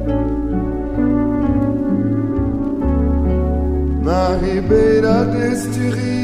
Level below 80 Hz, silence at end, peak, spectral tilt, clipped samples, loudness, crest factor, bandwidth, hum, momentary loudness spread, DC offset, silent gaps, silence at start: -24 dBFS; 0 s; -2 dBFS; -8 dB/octave; under 0.1%; -17 LUFS; 14 dB; 13.5 kHz; none; 6 LU; under 0.1%; none; 0 s